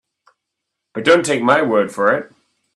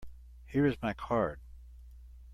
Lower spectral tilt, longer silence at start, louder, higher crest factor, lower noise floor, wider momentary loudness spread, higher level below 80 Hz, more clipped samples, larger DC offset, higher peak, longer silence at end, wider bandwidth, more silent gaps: second, -4 dB/octave vs -8.5 dB/octave; first, 0.95 s vs 0 s; first, -16 LUFS vs -32 LUFS; about the same, 18 dB vs 18 dB; first, -79 dBFS vs -51 dBFS; second, 7 LU vs 24 LU; second, -64 dBFS vs -50 dBFS; neither; neither; first, 0 dBFS vs -16 dBFS; first, 0.5 s vs 0 s; about the same, 12 kHz vs 12.5 kHz; neither